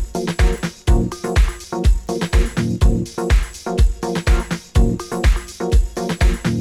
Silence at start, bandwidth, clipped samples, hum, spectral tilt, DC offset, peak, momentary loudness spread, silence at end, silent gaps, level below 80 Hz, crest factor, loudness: 0 s; 13.5 kHz; under 0.1%; none; -6 dB/octave; under 0.1%; -2 dBFS; 3 LU; 0 s; none; -18 dBFS; 14 dB; -20 LUFS